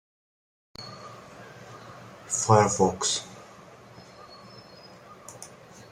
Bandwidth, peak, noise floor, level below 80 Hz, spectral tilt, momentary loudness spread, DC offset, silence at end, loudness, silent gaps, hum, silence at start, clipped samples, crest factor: 14.5 kHz; -4 dBFS; -49 dBFS; -64 dBFS; -4 dB/octave; 27 LU; under 0.1%; 0.45 s; -24 LUFS; none; none; 0.8 s; under 0.1%; 26 dB